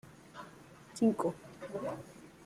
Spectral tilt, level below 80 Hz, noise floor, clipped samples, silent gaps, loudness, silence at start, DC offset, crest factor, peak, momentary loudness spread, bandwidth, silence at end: -6.5 dB/octave; -72 dBFS; -55 dBFS; under 0.1%; none; -35 LUFS; 0.05 s; under 0.1%; 20 dB; -18 dBFS; 22 LU; 14.5 kHz; 0 s